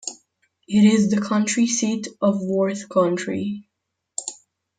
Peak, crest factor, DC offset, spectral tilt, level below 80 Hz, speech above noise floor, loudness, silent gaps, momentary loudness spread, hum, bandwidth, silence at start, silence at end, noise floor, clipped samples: -6 dBFS; 16 dB; under 0.1%; -5 dB/octave; -66 dBFS; 55 dB; -21 LUFS; none; 15 LU; none; 9.4 kHz; 0.05 s; 0.45 s; -74 dBFS; under 0.1%